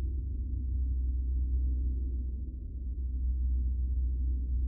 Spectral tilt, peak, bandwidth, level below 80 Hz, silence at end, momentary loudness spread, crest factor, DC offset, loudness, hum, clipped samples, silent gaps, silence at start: -21 dB/octave; -24 dBFS; 0.6 kHz; -32 dBFS; 0 s; 6 LU; 8 dB; under 0.1%; -34 LUFS; none; under 0.1%; none; 0 s